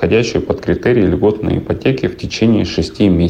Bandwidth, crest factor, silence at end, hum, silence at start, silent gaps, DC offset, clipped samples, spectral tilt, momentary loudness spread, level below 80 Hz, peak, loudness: 9.4 kHz; 10 dB; 0 s; none; 0 s; none; under 0.1%; under 0.1%; -7 dB/octave; 5 LU; -32 dBFS; -4 dBFS; -15 LUFS